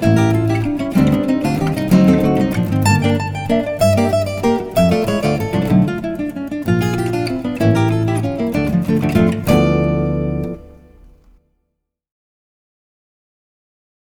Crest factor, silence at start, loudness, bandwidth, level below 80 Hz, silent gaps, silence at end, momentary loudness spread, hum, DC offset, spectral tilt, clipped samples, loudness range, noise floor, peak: 16 dB; 0 s; -16 LUFS; 18.5 kHz; -36 dBFS; none; 3.45 s; 6 LU; none; under 0.1%; -7 dB/octave; under 0.1%; 5 LU; -73 dBFS; -2 dBFS